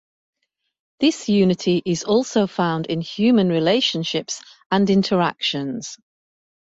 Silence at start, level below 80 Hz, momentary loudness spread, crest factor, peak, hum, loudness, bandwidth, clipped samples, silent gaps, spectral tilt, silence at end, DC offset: 1 s; -60 dBFS; 9 LU; 16 dB; -4 dBFS; none; -20 LUFS; 8 kHz; under 0.1%; 4.66-4.70 s; -5 dB/octave; 0.8 s; under 0.1%